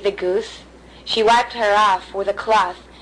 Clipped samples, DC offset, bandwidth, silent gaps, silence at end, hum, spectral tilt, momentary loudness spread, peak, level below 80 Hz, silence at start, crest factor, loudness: under 0.1%; under 0.1%; 10.5 kHz; none; 0.2 s; none; -3 dB/octave; 9 LU; -8 dBFS; -48 dBFS; 0 s; 12 dB; -18 LUFS